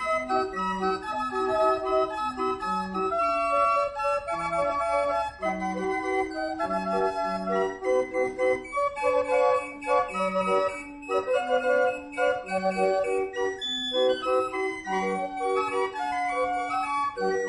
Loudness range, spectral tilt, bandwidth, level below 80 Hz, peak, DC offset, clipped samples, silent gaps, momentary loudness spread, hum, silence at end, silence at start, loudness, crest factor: 2 LU; -4.5 dB/octave; 11 kHz; -56 dBFS; -12 dBFS; under 0.1%; under 0.1%; none; 5 LU; none; 0 s; 0 s; -27 LUFS; 16 dB